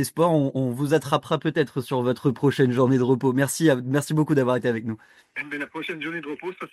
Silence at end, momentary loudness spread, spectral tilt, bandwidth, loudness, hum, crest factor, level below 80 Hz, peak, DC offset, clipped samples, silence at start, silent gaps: 0.05 s; 11 LU; -6 dB/octave; 14.5 kHz; -23 LUFS; none; 18 dB; -64 dBFS; -6 dBFS; under 0.1%; under 0.1%; 0 s; none